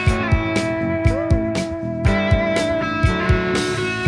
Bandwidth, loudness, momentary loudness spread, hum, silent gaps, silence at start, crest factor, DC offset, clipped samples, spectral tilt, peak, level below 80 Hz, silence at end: 10.5 kHz; -19 LUFS; 4 LU; none; none; 0 s; 16 dB; under 0.1%; under 0.1%; -6 dB/octave; -4 dBFS; -26 dBFS; 0 s